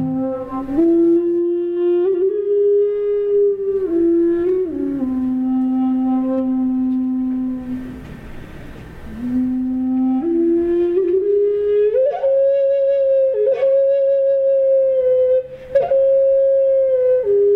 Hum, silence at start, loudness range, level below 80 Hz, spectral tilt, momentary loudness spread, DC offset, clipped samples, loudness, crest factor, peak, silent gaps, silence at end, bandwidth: none; 0 s; 6 LU; -46 dBFS; -9.5 dB/octave; 9 LU; under 0.1%; under 0.1%; -17 LUFS; 10 dB; -6 dBFS; none; 0 s; 4.1 kHz